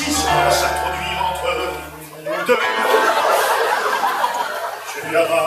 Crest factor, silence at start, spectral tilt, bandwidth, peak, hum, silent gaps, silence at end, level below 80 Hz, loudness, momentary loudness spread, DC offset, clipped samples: 16 dB; 0 s; -2.5 dB/octave; 15.5 kHz; -4 dBFS; none; none; 0 s; -42 dBFS; -18 LUFS; 11 LU; under 0.1%; under 0.1%